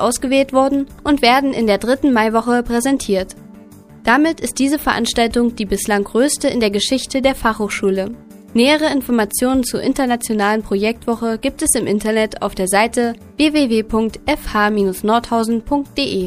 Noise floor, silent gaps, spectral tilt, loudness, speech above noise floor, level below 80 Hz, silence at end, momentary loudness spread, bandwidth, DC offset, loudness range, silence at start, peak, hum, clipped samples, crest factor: -40 dBFS; none; -3.5 dB/octave; -16 LUFS; 24 dB; -38 dBFS; 0 s; 6 LU; 15.5 kHz; under 0.1%; 1 LU; 0 s; 0 dBFS; none; under 0.1%; 16 dB